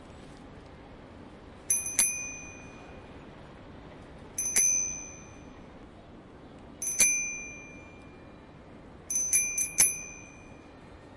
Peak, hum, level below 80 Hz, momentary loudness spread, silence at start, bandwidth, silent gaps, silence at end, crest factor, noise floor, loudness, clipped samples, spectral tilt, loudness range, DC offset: -6 dBFS; none; -56 dBFS; 27 LU; 0 s; 11.5 kHz; none; 0 s; 28 dB; -50 dBFS; -25 LUFS; under 0.1%; -0.5 dB/octave; 3 LU; under 0.1%